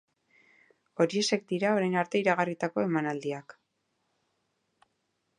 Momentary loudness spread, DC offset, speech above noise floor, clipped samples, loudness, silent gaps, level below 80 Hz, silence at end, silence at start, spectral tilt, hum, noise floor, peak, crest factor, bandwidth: 9 LU; under 0.1%; 50 dB; under 0.1%; -29 LUFS; none; -80 dBFS; 1.85 s; 1 s; -5 dB/octave; none; -78 dBFS; -10 dBFS; 22 dB; 11.5 kHz